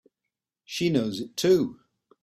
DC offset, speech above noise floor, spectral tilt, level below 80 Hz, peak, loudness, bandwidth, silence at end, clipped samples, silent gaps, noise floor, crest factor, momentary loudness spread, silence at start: under 0.1%; 62 dB; -5.5 dB/octave; -64 dBFS; -10 dBFS; -26 LUFS; 14 kHz; 0.5 s; under 0.1%; none; -86 dBFS; 18 dB; 10 LU; 0.7 s